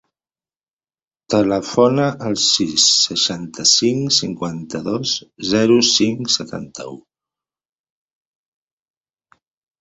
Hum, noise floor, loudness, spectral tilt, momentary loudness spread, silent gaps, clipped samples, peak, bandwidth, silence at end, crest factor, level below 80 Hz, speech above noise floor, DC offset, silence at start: none; under -90 dBFS; -16 LUFS; -3 dB/octave; 14 LU; none; under 0.1%; -2 dBFS; 8.4 kHz; 2.8 s; 18 dB; -56 dBFS; over 73 dB; under 0.1%; 1.3 s